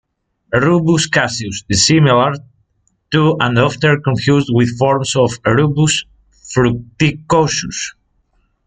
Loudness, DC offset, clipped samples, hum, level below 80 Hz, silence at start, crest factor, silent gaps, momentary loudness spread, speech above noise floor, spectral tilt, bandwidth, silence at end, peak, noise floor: -14 LUFS; under 0.1%; under 0.1%; none; -44 dBFS; 0.5 s; 14 dB; none; 7 LU; 49 dB; -5 dB/octave; 9.4 kHz; 0.75 s; 0 dBFS; -62 dBFS